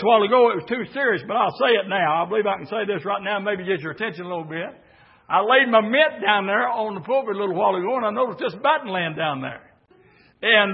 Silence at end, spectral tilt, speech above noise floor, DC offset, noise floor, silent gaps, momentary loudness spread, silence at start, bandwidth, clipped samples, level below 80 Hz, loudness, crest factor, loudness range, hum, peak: 0 s; -9.5 dB/octave; 34 dB; under 0.1%; -55 dBFS; none; 12 LU; 0 s; 5.8 kHz; under 0.1%; -70 dBFS; -21 LUFS; 18 dB; 4 LU; none; -2 dBFS